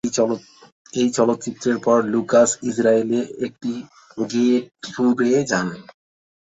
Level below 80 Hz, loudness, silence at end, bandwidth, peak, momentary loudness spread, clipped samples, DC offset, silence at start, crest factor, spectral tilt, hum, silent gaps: -64 dBFS; -20 LUFS; 0.65 s; 8.2 kHz; -4 dBFS; 12 LU; under 0.1%; under 0.1%; 0.05 s; 18 dB; -4.5 dB/octave; none; 0.72-0.85 s